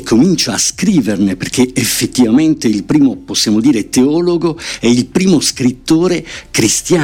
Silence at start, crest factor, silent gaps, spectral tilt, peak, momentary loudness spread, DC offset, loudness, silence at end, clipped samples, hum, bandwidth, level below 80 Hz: 0 s; 12 dB; none; -4 dB/octave; 0 dBFS; 5 LU; under 0.1%; -12 LUFS; 0 s; under 0.1%; none; 19 kHz; -40 dBFS